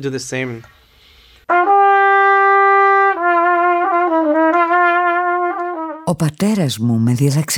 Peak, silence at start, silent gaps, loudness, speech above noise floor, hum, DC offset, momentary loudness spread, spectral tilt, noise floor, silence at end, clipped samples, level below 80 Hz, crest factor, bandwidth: -2 dBFS; 0 s; none; -14 LUFS; 31 dB; none; under 0.1%; 12 LU; -5.5 dB/octave; -48 dBFS; 0 s; under 0.1%; -56 dBFS; 12 dB; over 20 kHz